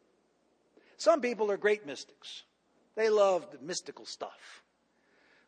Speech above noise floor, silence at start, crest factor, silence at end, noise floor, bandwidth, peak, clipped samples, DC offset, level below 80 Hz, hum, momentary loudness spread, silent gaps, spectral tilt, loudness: 41 dB; 1 s; 20 dB; 0.9 s; -72 dBFS; 10 kHz; -12 dBFS; under 0.1%; under 0.1%; -88 dBFS; none; 19 LU; none; -3 dB/octave; -30 LUFS